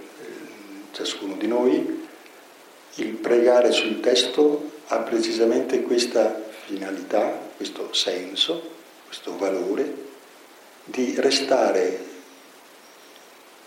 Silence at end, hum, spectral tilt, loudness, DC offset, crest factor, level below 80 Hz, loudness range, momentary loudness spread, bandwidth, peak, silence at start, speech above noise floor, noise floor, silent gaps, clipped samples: 1.3 s; none; -2.5 dB/octave; -23 LUFS; under 0.1%; 18 dB; -84 dBFS; 6 LU; 20 LU; 16.5 kHz; -6 dBFS; 0 s; 26 dB; -48 dBFS; none; under 0.1%